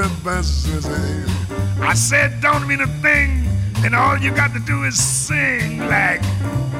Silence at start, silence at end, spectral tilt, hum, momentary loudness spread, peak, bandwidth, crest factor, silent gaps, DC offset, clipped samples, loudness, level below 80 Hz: 0 s; 0 s; -4 dB/octave; none; 7 LU; -4 dBFS; 16 kHz; 14 dB; none; under 0.1%; under 0.1%; -17 LUFS; -28 dBFS